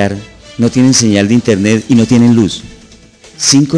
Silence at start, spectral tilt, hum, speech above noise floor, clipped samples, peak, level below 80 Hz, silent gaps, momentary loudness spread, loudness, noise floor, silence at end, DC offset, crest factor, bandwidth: 0 s; -4.5 dB/octave; none; 30 dB; under 0.1%; 0 dBFS; -42 dBFS; none; 10 LU; -10 LUFS; -39 dBFS; 0 s; under 0.1%; 10 dB; 10.5 kHz